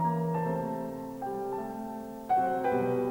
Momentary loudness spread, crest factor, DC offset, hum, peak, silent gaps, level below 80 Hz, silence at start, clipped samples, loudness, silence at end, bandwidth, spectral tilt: 10 LU; 14 dB; under 0.1%; none; -18 dBFS; none; -64 dBFS; 0 s; under 0.1%; -32 LUFS; 0 s; 19 kHz; -8.5 dB/octave